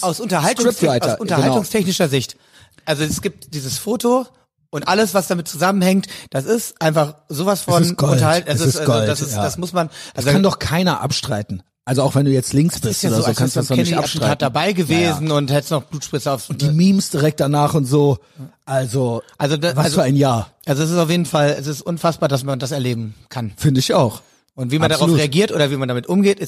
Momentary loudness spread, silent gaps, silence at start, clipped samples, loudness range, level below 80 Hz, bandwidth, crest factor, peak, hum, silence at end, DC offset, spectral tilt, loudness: 8 LU; none; 0 s; under 0.1%; 2 LU; -50 dBFS; 15.5 kHz; 16 dB; -2 dBFS; none; 0 s; under 0.1%; -5.5 dB/octave; -18 LUFS